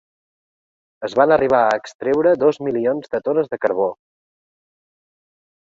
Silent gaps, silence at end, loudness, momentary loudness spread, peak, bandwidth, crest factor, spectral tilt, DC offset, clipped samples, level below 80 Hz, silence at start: 1.95-1.99 s; 1.85 s; -18 LUFS; 8 LU; -2 dBFS; 7.6 kHz; 18 dB; -6.5 dB/octave; under 0.1%; under 0.1%; -60 dBFS; 1 s